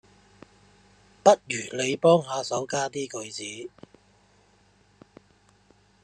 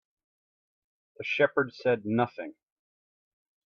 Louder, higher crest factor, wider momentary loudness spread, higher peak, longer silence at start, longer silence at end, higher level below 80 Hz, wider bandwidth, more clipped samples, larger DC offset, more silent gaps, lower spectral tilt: first, -25 LUFS vs -28 LUFS; about the same, 26 dB vs 22 dB; about the same, 15 LU vs 15 LU; first, -2 dBFS vs -10 dBFS; about the same, 1.25 s vs 1.2 s; first, 2.35 s vs 1.15 s; first, -70 dBFS vs -76 dBFS; first, 11.5 kHz vs 6.8 kHz; neither; neither; neither; second, -4 dB/octave vs -7 dB/octave